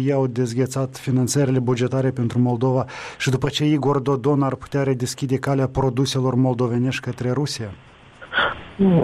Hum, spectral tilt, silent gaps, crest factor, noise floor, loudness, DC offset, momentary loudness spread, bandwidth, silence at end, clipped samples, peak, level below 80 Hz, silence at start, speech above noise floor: none; -6 dB/octave; none; 12 dB; -41 dBFS; -21 LUFS; under 0.1%; 5 LU; 13.5 kHz; 0 s; under 0.1%; -8 dBFS; -48 dBFS; 0 s; 21 dB